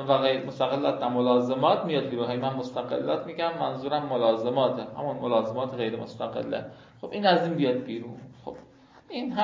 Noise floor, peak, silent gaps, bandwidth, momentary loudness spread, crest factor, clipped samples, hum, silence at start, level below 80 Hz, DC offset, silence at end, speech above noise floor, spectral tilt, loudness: -54 dBFS; -8 dBFS; none; 7.6 kHz; 14 LU; 20 dB; under 0.1%; none; 0 s; -68 dBFS; under 0.1%; 0 s; 27 dB; -7 dB/octave; -27 LUFS